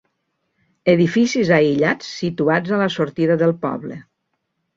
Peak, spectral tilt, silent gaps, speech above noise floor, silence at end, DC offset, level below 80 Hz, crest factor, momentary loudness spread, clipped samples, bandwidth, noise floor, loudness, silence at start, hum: -2 dBFS; -6 dB/octave; none; 56 dB; 0.75 s; under 0.1%; -58 dBFS; 18 dB; 10 LU; under 0.1%; 7.6 kHz; -73 dBFS; -18 LUFS; 0.85 s; none